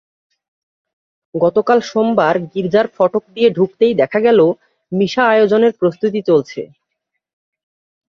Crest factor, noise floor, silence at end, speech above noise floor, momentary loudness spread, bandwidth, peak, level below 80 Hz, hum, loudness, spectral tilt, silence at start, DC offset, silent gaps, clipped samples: 16 dB; -76 dBFS; 1.45 s; 62 dB; 9 LU; 7 kHz; 0 dBFS; -60 dBFS; none; -15 LUFS; -6.5 dB/octave; 1.35 s; under 0.1%; none; under 0.1%